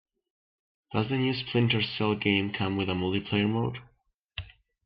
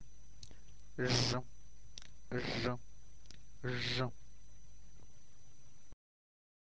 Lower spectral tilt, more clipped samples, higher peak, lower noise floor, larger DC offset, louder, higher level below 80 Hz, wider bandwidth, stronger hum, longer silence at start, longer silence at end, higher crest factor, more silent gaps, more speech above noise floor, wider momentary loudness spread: first, -9.5 dB/octave vs -4.5 dB/octave; neither; first, -10 dBFS vs -20 dBFS; about the same, -67 dBFS vs -65 dBFS; second, under 0.1% vs 0.7%; first, -28 LUFS vs -38 LUFS; about the same, -58 dBFS vs -60 dBFS; second, 5.6 kHz vs 8 kHz; neither; first, 0.9 s vs 0 s; second, 0.4 s vs 1.65 s; about the same, 20 dB vs 22 dB; first, 4.14-4.29 s vs none; first, 39 dB vs 28 dB; second, 16 LU vs 26 LU